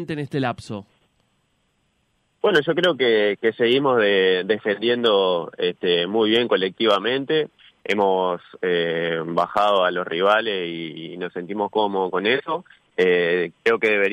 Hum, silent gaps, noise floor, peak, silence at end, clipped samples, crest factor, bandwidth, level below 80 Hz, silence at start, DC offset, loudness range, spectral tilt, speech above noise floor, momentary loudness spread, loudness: none; none; -68 dBFS; -6 dBFS; 0 s; under 0.1%; 16 dB; 10 kHz; -66 dBFS; 0 s; under 0.1%; 4 LU; -5.5 dB/octave; 47 dB; 11 LU; -21 LUFS